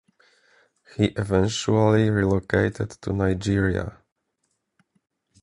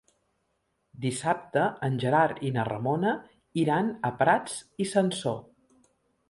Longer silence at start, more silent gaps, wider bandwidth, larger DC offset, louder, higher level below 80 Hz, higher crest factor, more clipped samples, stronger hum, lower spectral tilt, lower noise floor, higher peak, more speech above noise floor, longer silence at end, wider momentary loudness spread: about the same, 1 s vs 0.95 s; neither; about the same, 11 kHz vs 11.5 kHz; neither; first, -23 LUFS vs -28 LUFS; first, -42 dBFS vs -66 dBFS; about the same, 20 dB vs 20 dB; neither; neither; about the same, -6.5 dB/octave vs -5.5 dB/octave; about the same, -75 dBFS vs -76 dBFS; about the same, -6 dBFS vs -8 dBFS; first, 53 dB vs 49 dB; first, 1.5 s vs 0.9 s; about the same, 10 LU vs 9 LU